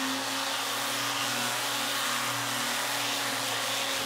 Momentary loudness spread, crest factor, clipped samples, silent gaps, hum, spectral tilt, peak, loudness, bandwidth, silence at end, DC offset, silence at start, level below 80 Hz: 1 LU; 14 dB; under 0.1%; none; none; -1 dB/octave; -16 dBFS; -28 LUFS; 16 kHz; 0 s; under 0.1%; 0 s; -76 dBFS